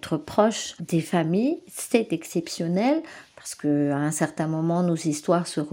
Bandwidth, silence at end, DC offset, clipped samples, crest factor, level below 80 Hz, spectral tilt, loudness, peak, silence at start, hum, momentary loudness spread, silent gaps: 17 kHz; 0 s; under 0.1%; under 0.1%; 20 dB; -66 dBFS; -5.5 dB/octave; -25 LUFS; -4 dBFS; 0.05 s; none; 7 LU; none